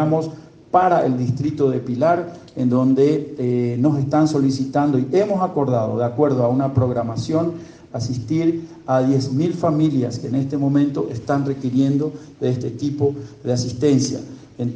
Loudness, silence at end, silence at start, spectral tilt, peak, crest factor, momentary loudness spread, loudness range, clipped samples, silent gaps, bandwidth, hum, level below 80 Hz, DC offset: -20 LUFS; 0 s; 0 s; -7.5 dB/octave; -2 dBFS; 16 dB; 8 LU; 3 LU; under 0.1%; none; 9.2 kHz; none; -56 dBFS; under 0.1%